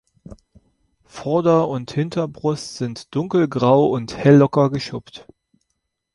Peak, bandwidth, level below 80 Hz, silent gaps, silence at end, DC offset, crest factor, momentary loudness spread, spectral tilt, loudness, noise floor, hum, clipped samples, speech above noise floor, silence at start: -2 dBFS; 11.5 kHz; -54 dBFS; none; 0.95 s; under 0.1%; 18 dB; 14 LU; -7.5 dB/octave; -19 LUFS; -75 dBFS; none; under 0.1%; 57 dB; 0.3 s